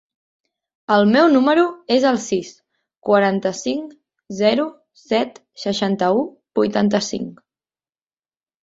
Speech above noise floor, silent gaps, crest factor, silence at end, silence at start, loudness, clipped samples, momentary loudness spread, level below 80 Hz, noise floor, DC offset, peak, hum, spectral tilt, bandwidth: over 72 dB; 2.97-3.01 s; 18 dB; 1.3 s; 0.9 s; -18 LUFS; under 0.1%; 15 LU; -62 dBFS; under -90 dBFS; under 0.1%; -2 dBFS; none; -5 dB/octave; 8 kHz